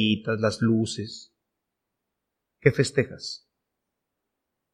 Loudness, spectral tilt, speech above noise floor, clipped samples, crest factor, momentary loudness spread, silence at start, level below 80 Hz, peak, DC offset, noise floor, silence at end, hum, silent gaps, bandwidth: -25 LUFS; -5.5 dB/octave; 58 dB; under 0.1%; 24 dB; 15 LU; 0 s; -60 dBFS; -4 dBFS; under 0.1%; -83 dBFS; 1.35 s; none; none; 11 kHz